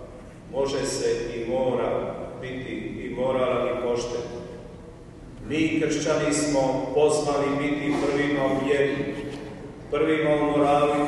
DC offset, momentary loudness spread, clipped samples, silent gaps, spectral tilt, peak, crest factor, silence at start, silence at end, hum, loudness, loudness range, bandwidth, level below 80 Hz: under 0.1%; 18 LU; under 0.1%; none; -5 dB/octave; -10 dBFS; 16 dB; 0 s; 0 s; none; -25 LUFS; 5 LU; 12 kHz; -48 dBFS